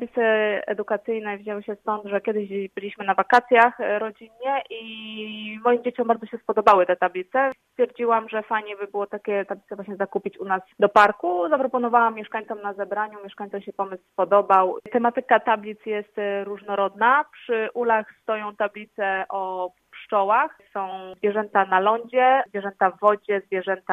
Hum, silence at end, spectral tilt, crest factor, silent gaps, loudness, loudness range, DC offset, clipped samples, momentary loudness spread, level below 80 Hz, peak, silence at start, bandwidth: none; 0 s; -6 dB/octave; 20 dB; none; -23 LUFS; 3 LU; under 0.1%; under 0.1%; 13 LU; -70 dBFS; -2 dBFS; 0 s; 10.5 kHz